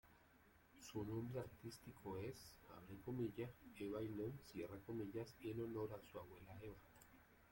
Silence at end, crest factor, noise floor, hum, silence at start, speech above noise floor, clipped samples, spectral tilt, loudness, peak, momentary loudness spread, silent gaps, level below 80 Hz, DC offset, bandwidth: 0 s; 16 dB; -72 dBFS; none; 0.05 s; 21 dB; under 0.1%; -7 dB/octave; -52 LUFS; -36 dBFS; 13 LU; none; -74 dBFS; under 0.1%; 16.5 kHz